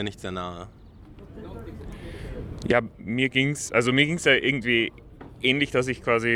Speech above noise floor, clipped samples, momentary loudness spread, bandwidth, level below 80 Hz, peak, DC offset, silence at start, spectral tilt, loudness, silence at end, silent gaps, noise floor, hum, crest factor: 22 dB; under 0.1%; 20 LU; 15.5 kHz; -46 dBFS; -6 dBFS; under 0.1%; 0 s; -4.5 dB/octave; -23 LUFS; 0 s; none; -46 dBFS; none; 20 dB